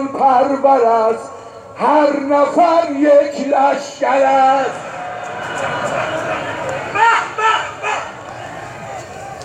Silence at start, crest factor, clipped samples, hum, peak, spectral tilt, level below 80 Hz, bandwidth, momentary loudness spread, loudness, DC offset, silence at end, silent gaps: 0 s; 14 dB; under 0.1%; none; -2 dBFS; -4.5 dB/octave; -56 dBFS; 10.5 kHz; 17 LU; -15 LUFS; under 0.1%; 0 s; none